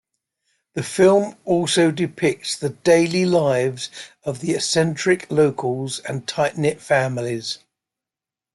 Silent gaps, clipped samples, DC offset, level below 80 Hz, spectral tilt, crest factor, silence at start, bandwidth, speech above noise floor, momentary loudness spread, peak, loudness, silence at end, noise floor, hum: none; under 0.1%; under 0.1%; -62 dBFS; -5 dB/octave; 16 dB; 0.75 s; 12 kHz; 69 dB; 13 LU; -4 dBFS; -20 LUFS; 1 s; -89 dBFS; none